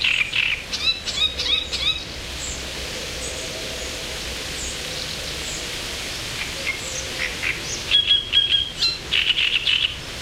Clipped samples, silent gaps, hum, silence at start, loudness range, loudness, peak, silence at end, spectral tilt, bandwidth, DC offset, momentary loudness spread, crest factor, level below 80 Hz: under 0.1%; none; none; 0 s; 9 LU; -21 LUFS; -6 dBFS; 0 s; -1 dB/octave; 16 kHz; under 0.1%; 11 LU; 18 dB; -40 dBFS